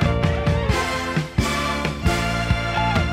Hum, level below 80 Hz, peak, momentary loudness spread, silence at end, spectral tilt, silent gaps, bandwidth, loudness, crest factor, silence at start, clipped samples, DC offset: none; -28 dBFS; -6 dBFS; 2 LU; 0 s; -5.5 dB/octave; none; 16 kHz; -22 LUFS; 16 dB; 0 s; under 0.1%; under 0.1%